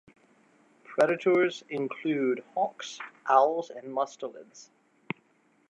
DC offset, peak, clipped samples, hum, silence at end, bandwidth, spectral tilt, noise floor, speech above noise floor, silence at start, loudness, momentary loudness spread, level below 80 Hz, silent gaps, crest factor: under 0.1%; -8 dBFS; under 0.1%; none; 1.1 s; 10.5 kHz; -5 dB/octave; -66 dBFS; 38 dB; 0.9 s; -28 LUFS; 17 LU; -84 dBFS; none; 22 dB